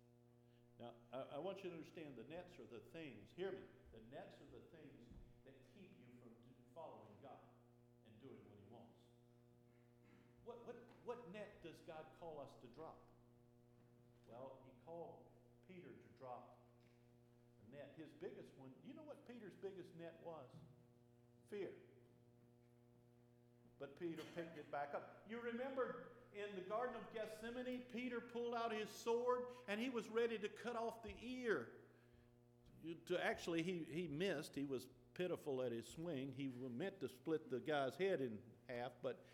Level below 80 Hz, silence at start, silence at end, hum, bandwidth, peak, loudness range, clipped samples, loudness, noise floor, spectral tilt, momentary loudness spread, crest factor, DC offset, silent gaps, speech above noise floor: -80 dBFS; 0 s; 0 s; none; 16.5 kHz; -28 dBFS; 17 LU; under 0.1%; -49 LUFS; -71 dBFS; -5.5 dB/octave; 21 LU; 22 dB; under 0.1%; none; 23 dB